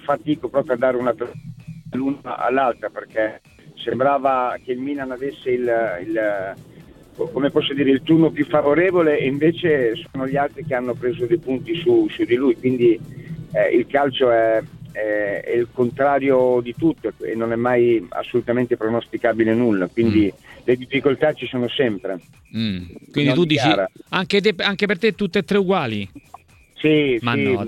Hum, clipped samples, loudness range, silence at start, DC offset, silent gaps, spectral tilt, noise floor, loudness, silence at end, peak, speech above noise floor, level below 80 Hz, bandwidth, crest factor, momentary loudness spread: none; under 0.1%; 4 LU; 0.05 s; under 0.1%; none; -7 dB/octave; -43 dBFS; -20 LUFS; 0 s; -2 dBFS; 24 dB; -54 dBFS; 11.5 kHz; 18 dB; 10 LU